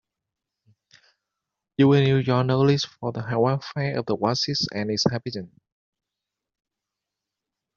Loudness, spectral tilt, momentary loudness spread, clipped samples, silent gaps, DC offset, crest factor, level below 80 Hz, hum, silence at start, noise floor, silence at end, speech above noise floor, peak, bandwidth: -23 LUFS; -5.5 dB/octave; 12 LU; under 0.1%; none; under 0.1%; 20 dB; -62 dBFS; none; 1.8 s; -86 dBFS; 2.3 s; 64 dB; -6 dBFS; 7.4 kHz